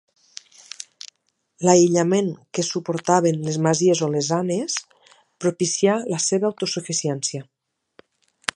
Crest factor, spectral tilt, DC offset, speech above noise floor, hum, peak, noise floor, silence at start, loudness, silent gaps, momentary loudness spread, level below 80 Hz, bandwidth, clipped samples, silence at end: 22 dB; -4.5 dB/octave; under 0.1%; 49 dB; none; 0 dBFS; -70 dBFS; 0.8 s; -21 LUFS; none; 20 LU; -68 dBFS; 11.5 kHz; under 0.1%; 1.15 s